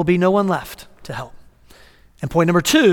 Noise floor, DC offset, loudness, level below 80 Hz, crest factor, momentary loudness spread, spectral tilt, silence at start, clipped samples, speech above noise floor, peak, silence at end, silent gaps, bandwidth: -47 dBFS; under 0.1%; -17 LUFS; -46 dBFS; 16 dB; 21 LU; -5 dB/octave; 0 s; under 0.1%; 31 dB; -2 dBFS; 0 s; none; 18 kHz